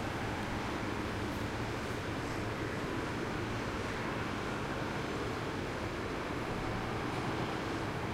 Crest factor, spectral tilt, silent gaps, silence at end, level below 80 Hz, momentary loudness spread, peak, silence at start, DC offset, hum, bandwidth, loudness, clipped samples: 14 dB; -5.5 dB/octave; none; 0 s; -50 dBFS; 1 LU; -24 dBFS; 0 s; under 0.1%; none; 16 kHz; -37 LUFS; under 0.1%